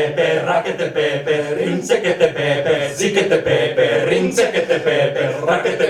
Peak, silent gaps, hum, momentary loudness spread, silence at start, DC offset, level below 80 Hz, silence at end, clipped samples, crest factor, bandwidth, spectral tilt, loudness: -2 dBFS; none; none; 4 LU; 0 s; under 0.1%; -54 dBFS; 0 s; under 0.1%; 16 dB; 13.5 kHz; -4.5 dB/octave; -17 LUFS